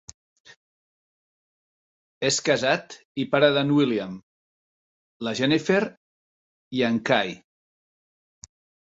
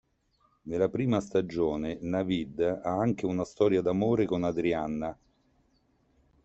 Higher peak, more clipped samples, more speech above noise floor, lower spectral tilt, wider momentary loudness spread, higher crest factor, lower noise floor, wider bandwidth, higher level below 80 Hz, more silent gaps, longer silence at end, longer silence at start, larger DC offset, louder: first, -4 dBFS vs -12 dBFS; neither; first, over 67 dB vs 42 dB; second, -4.5 dB/octave vs -7.5 dB/octave; first, 14 LU vs 7 LU; about the same, 22 dB vs 18 dB; first, under -90 dBFS vs -70 dBFS; about the same, 8.2 kHz vs 8.2 kHz; second, -66 dBFS vs -58 dBFS; first, 3.05-3.15 s, 4.23-5.20 s, 5.97-6.71 s vs none; first, 1.45 s vs 1.3 s; first, 2.2 s vs 0.65 s; neither; first, -23 LUFS vs -29 LUFS